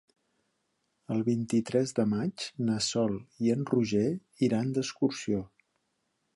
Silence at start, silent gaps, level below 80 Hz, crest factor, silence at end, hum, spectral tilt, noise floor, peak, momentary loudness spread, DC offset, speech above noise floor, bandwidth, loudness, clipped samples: 1.1 s; none; -64 dBFS; 18 dB; 0.9 s; none; -5.5 dB/octave; -78 dBFS; -14 dBFS; 5 LU; under 0.1%; 49 dB; 11.5 kHz; -30 LUFS; under 0.1%